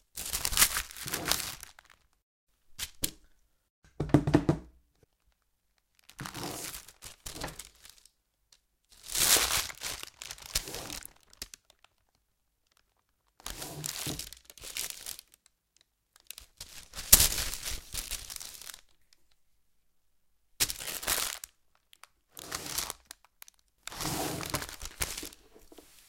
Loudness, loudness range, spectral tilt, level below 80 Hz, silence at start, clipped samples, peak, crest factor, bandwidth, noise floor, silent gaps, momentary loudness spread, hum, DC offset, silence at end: -30 LUFS; 14 LU; -2 dB/octave; -50 dBFS; 0.15 s; under 0.1%; 0 dBFS; 36 dB; 17 kHz; -77 dBFS; 2.22-2.47 s, 3.70-3.82 s; 23 LU; none; under 0.1%; 0.25 s